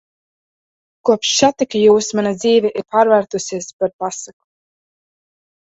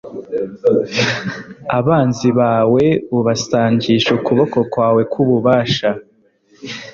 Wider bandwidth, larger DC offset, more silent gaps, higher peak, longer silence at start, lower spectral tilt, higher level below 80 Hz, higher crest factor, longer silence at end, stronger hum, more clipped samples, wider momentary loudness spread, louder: about the same, 8 kHz vs 7.4 kHz; neither; first, 3.73-3.79 s, 3.93-3.99 s vs none; about the same, 0 dBFS vs 0 dBFS; first, 1.05 s vs 0.05 s; second, -3.5 dB/octave vs -6 dB/octave; second, -60 dBFS vs -52 dBFS; about the same, 18 dB vs 14 dB; first, 1.4 s vs 0.05 s; neither; neither; about the same, 12 LU vs 12 LU; about the same, -16 LUFS vs -15 LUFS